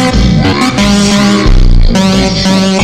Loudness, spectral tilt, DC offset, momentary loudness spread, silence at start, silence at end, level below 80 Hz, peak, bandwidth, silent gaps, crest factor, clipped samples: -8 LUFS; -5 dB/octave; under 0.1%; 2 LU; 0 s; 0 s; -10 dBFS; 0 dBFS; 12.5 kHz; none; 6 dB; under 0.1%